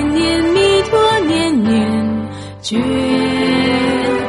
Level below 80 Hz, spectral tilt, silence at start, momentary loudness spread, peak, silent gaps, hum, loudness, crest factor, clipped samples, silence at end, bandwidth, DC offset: -40 dBFS; -5 dB/octave; 0 s; 8 LU; 0 dBFS; none; none; -14 LUFS; 14 dB; under 0.1%; 0 s; 11.5 kHz; under 0.1%